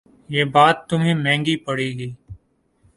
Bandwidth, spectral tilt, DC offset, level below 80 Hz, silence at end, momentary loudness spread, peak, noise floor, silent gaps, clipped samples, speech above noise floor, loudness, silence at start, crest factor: 11.5 kHz; -5.5 dB/octave; under 0.1%; -54 dBFS; 0.6 s; 12 LU; 0 dBFS; -61 dBFS; none; under 0.1%; 42 dB; -19 LUFS; 0.3 s; 20 dB